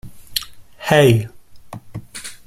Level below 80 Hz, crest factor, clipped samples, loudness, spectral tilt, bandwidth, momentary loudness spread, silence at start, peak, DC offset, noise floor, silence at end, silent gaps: -46 dBFS; 20 dB; under 0.1%; -17 LUFS; -5.5 dB/octave; 15.5 kHz; 26 LU; 0.05 s; 0 dBFS; under 0.1%; -36 dBFS; 0.1 s; none